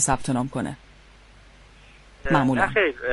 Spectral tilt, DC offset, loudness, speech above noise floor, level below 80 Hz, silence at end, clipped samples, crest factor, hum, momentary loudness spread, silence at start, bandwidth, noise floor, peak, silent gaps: -4.5 dB/octave; under 0.1%; -23 LUFS; 28 dB; -44 dBFS; 0 s; under 0.1%; 20 dB; 50 Hz at -50 dBFS; 14 LU; 0 s; 11.5 kHz; -50 dBFS; -6 dBFS; none